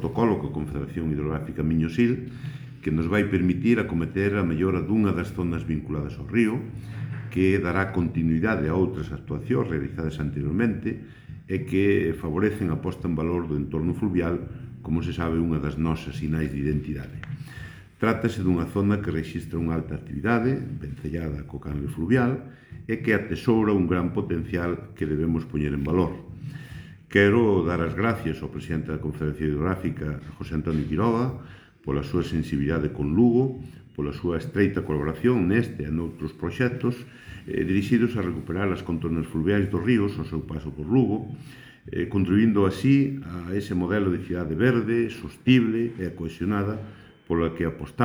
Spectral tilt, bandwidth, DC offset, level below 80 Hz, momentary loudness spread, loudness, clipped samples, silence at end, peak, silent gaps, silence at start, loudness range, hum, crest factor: -8.5 dB/octave; 19 kHz; under 0.1%; -42 dBFS; 12 LU; -26 LUFS; under 0.1%; 0 s; -4 dBFS; none; 0 s; 3 LU; none; 22 dB